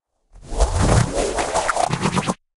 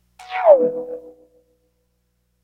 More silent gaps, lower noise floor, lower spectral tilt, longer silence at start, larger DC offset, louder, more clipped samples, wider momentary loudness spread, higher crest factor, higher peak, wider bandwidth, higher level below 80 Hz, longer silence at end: neither; second, -45 dBFS vs -68 dBFS; about the same, -5 dB/octave vs -6 dB/octave; first, 0.35 s vs 0.2 s; neither; second, -20 LUFS vs -17 LUFS; neither; second, 6 LU vs 20 LU; about the same, 18 dB vs 20 dB; second, -4 dBFS vs 0 dBFS; first, 11.5 kHz vs 6 kHz; first, -28 dBFS vs -66 dBFS; second, 0.2 s vs 1.35 s